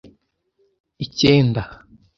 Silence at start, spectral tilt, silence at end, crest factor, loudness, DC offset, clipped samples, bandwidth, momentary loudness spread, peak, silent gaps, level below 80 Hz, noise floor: 1 s; -6 dB/octave; 0.45 s; 20 dB; -18 LUFS; under 0.1%; under 0.1%; 7.4 kHz; 18 LU; 0 dBFS; none; -46 dBFS; -66 dBFS